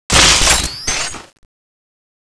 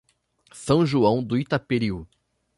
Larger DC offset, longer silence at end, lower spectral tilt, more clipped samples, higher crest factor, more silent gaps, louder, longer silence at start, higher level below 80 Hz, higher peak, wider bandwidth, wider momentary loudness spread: neither; first, 1 s vs 0.55 s; second, -1 dB/octave vs -7 dB/octave; neither; about the same, 16 dB vs 18 dB; neither; first, -11 LUFS vs -23 LUFS; second, 0.1 s vs 0.55 s; first, -26 dBFS vs -52 dBFS; first, 0 dBFS vs -6 dBFS; about the same, 11 kHz vs 11.5 kHz; first, 15 LU vs 12 LU